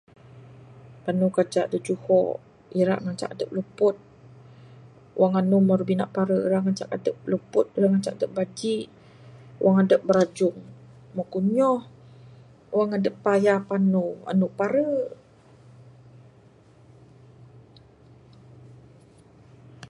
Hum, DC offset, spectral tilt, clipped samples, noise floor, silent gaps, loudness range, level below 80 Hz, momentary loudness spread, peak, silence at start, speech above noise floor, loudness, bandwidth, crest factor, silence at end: none; under 0.1%; -7.5 dB/octave; under 0.1%; -54 dBFS; none; 4 LU; -66 dBFS; 11 LU; -6 dBFS; 0.35 s; 31 dB; -24 LUFS; 11 kHz; 18 dB; 0.05 s